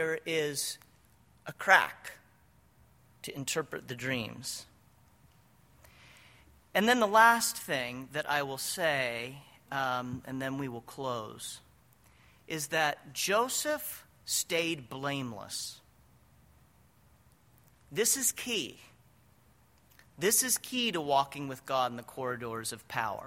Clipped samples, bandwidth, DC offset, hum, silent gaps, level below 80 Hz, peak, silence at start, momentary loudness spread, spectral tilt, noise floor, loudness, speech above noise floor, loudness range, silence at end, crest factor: under 0.1%; 16.5 kHz; under 0.1%; none; none; -70 dBFS; -6 dBFS; 0 s; 17 LU; -2 dB/octave; -64 dBFS; -31 LUFS; 33 dB; 10 LU; 0 s; 28 dB